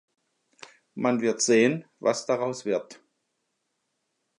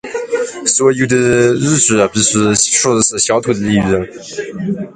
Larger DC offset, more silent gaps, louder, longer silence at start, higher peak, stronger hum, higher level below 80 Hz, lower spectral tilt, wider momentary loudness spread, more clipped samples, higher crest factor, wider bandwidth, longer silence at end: neither; neither; second, -25 LUFS vs -12 LUFS; first, 0.95 s vs 0.05 s; second, -10 dBFS vs 0 dBFS; neither; second, -80 dBFS vs -44 dBFS; about the same, -4 dB/octave vs -3.5 dB/octave; about the same, 9 LU vs 10 LU; neither; first, 20 dB vs 14 dB; about the same, 11.5 kHz vs 10.5 kHz; first, 1.45 s vs 0.05 s